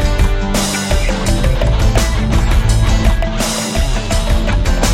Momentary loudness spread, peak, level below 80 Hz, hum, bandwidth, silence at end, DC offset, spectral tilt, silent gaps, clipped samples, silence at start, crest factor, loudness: 3 LU; 0 dBFS; -14 dBFS; none; 16 kHz; 0 s; 0.5%; -4.5 dB/octave; none; under 0.1%; 0 s; 12 dB; -15 LUFS